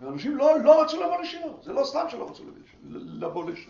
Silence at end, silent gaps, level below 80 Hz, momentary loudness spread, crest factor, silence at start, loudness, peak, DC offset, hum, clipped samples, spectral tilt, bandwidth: 0.05 s; none; -66 dBFS; 21 LU; 20 dB; 0 s; -24 LUFS; -6 dBFS; under 0.1%; none; under 0.1%; -5.5 dB/octave; 7.2 kHz